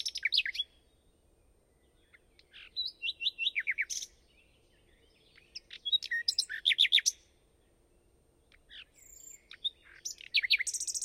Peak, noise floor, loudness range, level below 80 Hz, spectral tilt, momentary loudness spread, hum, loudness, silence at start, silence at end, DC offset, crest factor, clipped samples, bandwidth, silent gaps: -12 dBFS; -68 dBFS; 7 LU; -70 dBFS; 4 dB/octave; 25 LU; none; -30 LUFS; 0 s; 0 s; under 0.1%; 24 dB; under 0.1%; 16 kHz; none